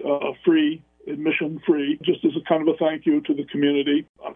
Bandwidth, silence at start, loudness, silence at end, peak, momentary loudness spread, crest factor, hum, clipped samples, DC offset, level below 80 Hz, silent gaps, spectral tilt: 3.7 kHz; 0 s; -22 LUFS; 0 s; -6 dBFS; 5 LU; 14 dB; none; under 0.1%; under 0.1%; -66 dBFS; 4.09-4.14 s; -9 dB/octave